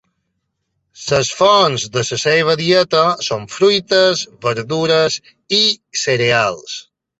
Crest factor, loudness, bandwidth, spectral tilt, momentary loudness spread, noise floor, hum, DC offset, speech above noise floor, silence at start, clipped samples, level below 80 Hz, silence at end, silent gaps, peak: 16 dB; -15 LUFS; 8.2 kHz; -3.5 dB/octave; 9 LU; -72 dBFS; none; under 0.1%; 56 dB; 1 s; under 0.1%; -54 dBFS; 0.4 s; none; 0 dBFS